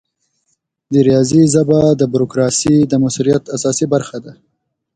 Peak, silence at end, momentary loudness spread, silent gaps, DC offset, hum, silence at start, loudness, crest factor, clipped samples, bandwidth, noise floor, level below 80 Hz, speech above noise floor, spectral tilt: 0 dBFS; 0.65 s; 7 LU; none; under 0.1%; none; 0.9 s; -13 LUFS; 14 dB; under 0.1%; 9.6 kHz; -67 dBFS; -48 dBFS; 54 dB; -6 dB/octave